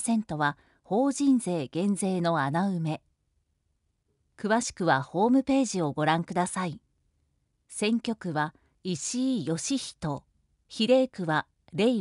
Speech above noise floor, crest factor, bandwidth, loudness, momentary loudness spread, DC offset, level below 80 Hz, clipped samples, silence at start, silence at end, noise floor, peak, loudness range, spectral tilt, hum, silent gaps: 48 dB; 18 dB; 11.5 kHz; -28 LUFS; 11 LU; under 0.1%; -64 dBFS; under 0.1%; 0 s; 0 s; -75 dBFS; -10 dBFS; 4 LU; -5 dB/octave; none; none